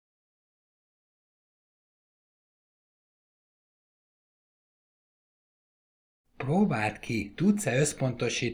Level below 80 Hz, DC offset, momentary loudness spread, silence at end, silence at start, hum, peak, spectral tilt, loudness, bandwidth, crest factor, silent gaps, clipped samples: -62 dBFS; under 0.1%; 8 LU; 0 s; 6.4 s; none; -12 dBFS; -5 dB/octave; -28 LUFS; 15.5 kHz; 22 dB; none; under 0.1%